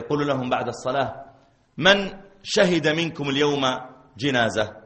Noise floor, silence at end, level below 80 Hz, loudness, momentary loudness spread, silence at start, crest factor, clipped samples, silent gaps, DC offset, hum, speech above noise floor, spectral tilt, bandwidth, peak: -54 dBFS; 0.05 s; -54 dBFS; -22 LUFS; 12 LU; 0 s; 20 dB; under 0.1%; none; under 0.1%; none; 31 dB; -4.5 dB/octave; 8.8 kHz; -2 dBFS